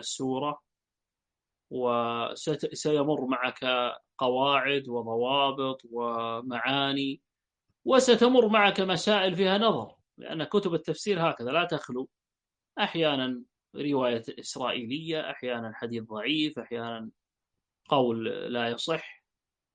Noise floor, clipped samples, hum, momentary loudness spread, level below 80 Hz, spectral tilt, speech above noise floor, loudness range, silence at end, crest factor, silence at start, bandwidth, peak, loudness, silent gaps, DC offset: under -90 dBFS; under 0.1%; none; 14 LU; -74 dBFS; -4.5 dB/octave; over 62 dB; 7 LU; 0.6 s; 22 dB; 0 s; 9.6 kHz; -8 dBFS; -28 LUFS; none; under 0.1%